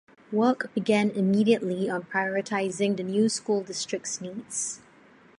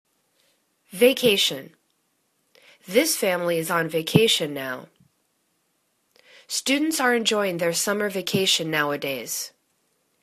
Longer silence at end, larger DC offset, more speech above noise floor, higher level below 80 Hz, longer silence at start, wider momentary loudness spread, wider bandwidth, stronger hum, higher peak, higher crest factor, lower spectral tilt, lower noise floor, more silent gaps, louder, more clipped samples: second, 0.6 s vs 0.75 s; neither; second, 29 dB vs 48 dB; second, -74 dBFS vs -68 dBFS; second, 0.3 s vs 0.9 s; about the same, 9 LU vs 11 LU; second, 11.5 kHz vs 14 kHz; neither; second, -10 dBFS vs -2 dBFS; second, 18 dB vs 24 dB; first, -4.5 dB/octave vs -3 dB/octave; second, -55 dBFS vs -71 dBFS; neither; second, -27 LUFS vs -22 LUFS; neither